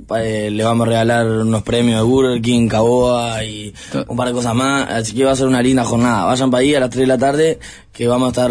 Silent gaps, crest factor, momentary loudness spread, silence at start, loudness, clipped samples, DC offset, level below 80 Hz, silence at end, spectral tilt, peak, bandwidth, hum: none; 12 dB; 8 LU; 0 s; -15 LUFS; under 0.1%; under 0.1%; -40 dBFS; 0 s; -5.5 dB/octave; -4 dBFS; 11 kHz; none